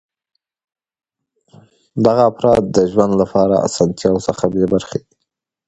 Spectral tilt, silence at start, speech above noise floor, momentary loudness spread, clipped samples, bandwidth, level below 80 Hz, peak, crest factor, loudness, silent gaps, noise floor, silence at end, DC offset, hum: -6.5 dB/octave; 1.95 s; 61 dB; 6 LU; under 0.1%; 10.5 kHz; -46 dBFS; 0 dBFS; 16 dB; -15 LUFS; none; -76 dBFS; 0.7 s; under 0.1%; none